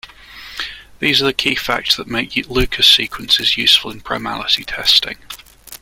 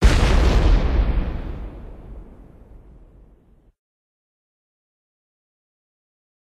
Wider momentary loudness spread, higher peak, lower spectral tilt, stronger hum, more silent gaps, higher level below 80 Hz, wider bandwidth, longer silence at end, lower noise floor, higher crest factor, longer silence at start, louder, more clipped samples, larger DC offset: second, 17 LU vs 23 LU; about the same, 0 dBFS vs -2 dBFS; second, -2 dB/octave vs -6 dB/octave; neither; neither; second, -36 dBFS vs -24 dBFS; first, 17 kHz vs 11 kHz; second, 0.05 s vs 4.35 s; second, -37 dBFS vs -53 dBFS; about the same, 18 dB vs 20 dB; about the same, 0.05 s vs 0 s; first, -14 LUFS vs -21 LUFS; neither; neither